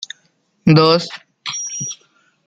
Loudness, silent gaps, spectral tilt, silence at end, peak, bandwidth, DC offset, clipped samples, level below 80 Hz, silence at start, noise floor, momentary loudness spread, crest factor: -16 LUFS; none; -5 dB/octave; 0.5 s; -2 dBFS; 7.8 kHz; under 0.1%; under 0.1%; -56 dBFS; 0 s; -61 dBFS; 21 LU; 16 dB